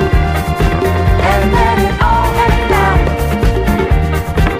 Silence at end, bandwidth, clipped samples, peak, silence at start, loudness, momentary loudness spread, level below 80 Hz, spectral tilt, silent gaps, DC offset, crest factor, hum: 0 s; 15.5 kHz; under 0.1%; 0 dBFS; 0 s; -13 LUFS; 3 LU; -16 dBFS; -6.5 dB/octave; none; under 0.1%; 10 dB; none